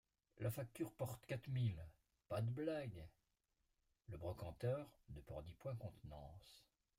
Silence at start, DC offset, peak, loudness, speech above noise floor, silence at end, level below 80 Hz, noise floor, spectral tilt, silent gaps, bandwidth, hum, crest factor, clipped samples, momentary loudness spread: 0.35 s; under 0.1%; -30 dBFS; -48 LUFS; 40 dB; 0.4 s; -68 dBFS; -87 dBFS; -7 dB/octave; none; 16 kHz; none; 18 dB; under 0.1%; 17 LU